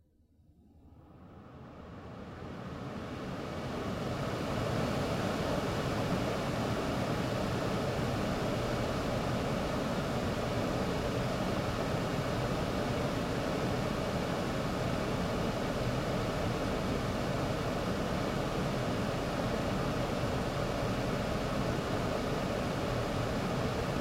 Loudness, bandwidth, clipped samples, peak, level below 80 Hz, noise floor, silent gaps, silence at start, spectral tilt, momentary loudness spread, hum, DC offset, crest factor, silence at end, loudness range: -34 LUFS; 16.5 kHz; under 0.1%; -20 dBFS; -46 dBFS; -65 dBFS; none; 0.75 s; -6 dB/octave; 6 LU; none; under 0.1%; 14 dB; 0 s; 4 LU